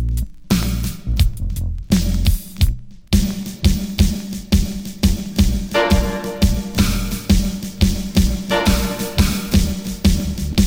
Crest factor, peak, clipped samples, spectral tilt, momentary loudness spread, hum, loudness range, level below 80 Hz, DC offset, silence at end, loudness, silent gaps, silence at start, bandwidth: 18 dB; 0 dBFS; under 0.1%; -5.5 dB/octave; 7 LU; none; 2 LU; -22 dBFS; under 0.1%; 0 s; -19 LUFS; none; 0 s; 17 kHz